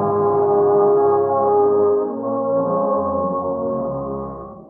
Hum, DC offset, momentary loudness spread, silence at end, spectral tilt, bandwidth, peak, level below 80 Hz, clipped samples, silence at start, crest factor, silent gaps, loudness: none; under 0.1%; 10 LU; 0.05 s; -11.5 dB/octave; 2 kHz; -6 dBFS; -50 dBFS; under 0.1%; 0 s; 12 dB; none; -18 LUFS